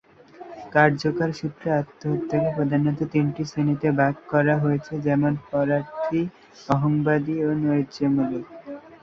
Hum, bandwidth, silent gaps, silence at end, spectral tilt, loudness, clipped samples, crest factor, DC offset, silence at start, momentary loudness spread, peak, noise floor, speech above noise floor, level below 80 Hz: none; 7.2 kHz; none; 0.05 s; -8 dB/octave; -23 LUFS; under 0.1%; 20 dB; under 0.1%; 0.4 s; 9 LU; -4 dBFS; -44 dBFS; 22 dB; -58 dBFS